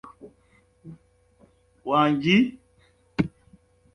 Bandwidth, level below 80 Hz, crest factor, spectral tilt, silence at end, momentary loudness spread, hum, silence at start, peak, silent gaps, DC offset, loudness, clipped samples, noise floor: 10.5 kHz; -56 dBFS; 20 dB; -6.5 dB/octave; 0.65 s; 18 LU; none; 0.25 s; -8 dBFS; none; under 0.1%; -23 LUFS; under 0.1%; -61 dBFS